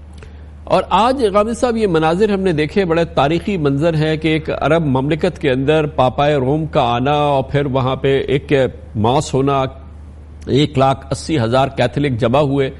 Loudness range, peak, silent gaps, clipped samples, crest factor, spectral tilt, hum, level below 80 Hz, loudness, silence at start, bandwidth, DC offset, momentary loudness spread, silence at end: 2 LU; -2 dBFS; none; under 0.1%; 14 dB; -6.5 dB/octave; none; -36 dBFS; -16 LUFS; 0 s; 11.5 kHz; under 0.1%; 4 LU; 0 s